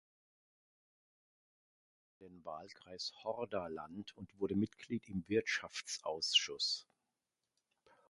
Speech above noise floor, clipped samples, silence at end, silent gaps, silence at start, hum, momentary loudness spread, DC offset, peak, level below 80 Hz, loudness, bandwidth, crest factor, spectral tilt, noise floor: 49 dB; under 0.1%; 1.3 s; none; 2.2 s; none; 18 LU; under 0.1%; -18 dBFS; -72 dBFS; -38 LUFS; 11.5 kHz; 26 dB; -3 dB/octave; -90 dBFS